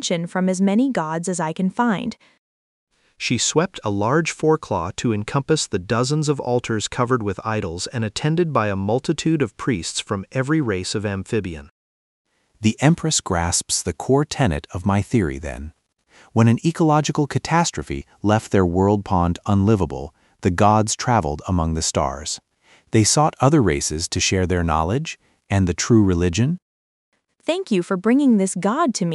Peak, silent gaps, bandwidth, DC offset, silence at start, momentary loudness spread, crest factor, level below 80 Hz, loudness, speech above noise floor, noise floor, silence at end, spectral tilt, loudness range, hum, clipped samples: -2 dBFS; 2.39-2.87 s, 11.71-12.25 s, 26.62-27.12 s; 11.5 kHz; under 0.1%; 0 s; 9 LU; 18 dB; -42 dBFS; -20 LUFS; 35 dB; -54 dBFS; 0 s; -5 dB/octave; 3 LU; none; under 0.1%